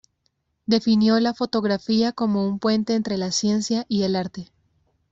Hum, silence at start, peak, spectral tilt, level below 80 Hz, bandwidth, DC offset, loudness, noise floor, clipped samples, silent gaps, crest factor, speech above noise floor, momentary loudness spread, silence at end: none; 0.7 s; -6 dBFS; -5 dB/octave; -60 dBFS; 7.8 kHz; under 0.1%; -22 LUFS; -72 dBFS; under 0.1%; none; 18 dB; 50 dB; 6 LU; 0.7 s